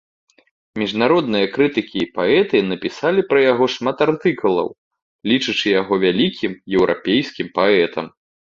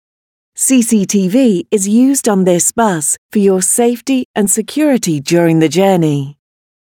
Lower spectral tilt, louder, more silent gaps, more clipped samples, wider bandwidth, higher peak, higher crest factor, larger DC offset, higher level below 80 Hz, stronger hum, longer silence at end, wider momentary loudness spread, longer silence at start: about the same, -5.5 dB/octave vs -4.5 dB/octave; second, -18 LUFS vs -12 LUFS; first, 4.78-4.91 s, 5.02-5.19 s vs 3.18-3.29 s, 4.25-4.34 s; neither; second, 7.6 kHz vs 19 kHz; about the same, -2 dBFS vs 0 dBFS; about the same, 16 dB vs 12 dB; neither; about the same, -56 dBFS vs -58 dBFS; neither; second, 0.45 s vs 0.6 s; first, 9 LU vs 5 LU; first, 0.75 s vs 0.55 s